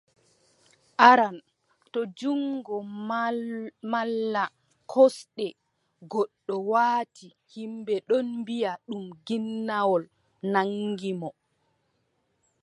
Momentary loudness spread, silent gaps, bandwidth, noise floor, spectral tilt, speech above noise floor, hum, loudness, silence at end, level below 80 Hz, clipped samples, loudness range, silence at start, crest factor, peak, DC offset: 15 LU; none; 11.5 kHz; -73 dBFS; -5.5 dB/octave; 47 dB; none; -26 LUFS; 1.3 s; -82 dBFS; under 0.1%; 5 LU; 1 s; 26 dB; -2 dBFS; under 0.1%